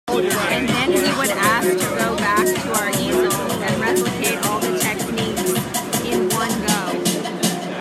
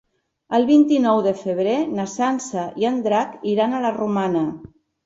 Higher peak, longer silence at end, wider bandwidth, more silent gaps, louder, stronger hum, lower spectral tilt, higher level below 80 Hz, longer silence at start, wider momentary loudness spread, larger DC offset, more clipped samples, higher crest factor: about the same, -4 dBFS vs -6 dBFS; second, 0 s vs 0.4 s; first, 16 kHz vs 8 kHz; neither; about the same, -19 LUFS vs -20 LUFS; neither; second, -3.5 dB/octave vs -6 dB/octave; first, -48 dBFS vs -62 dBFS; second, 0.05 s vs 0.5 s; second, 4 LU vs 9 LU; neither; neither; about the same, 16 dB vs 16 dB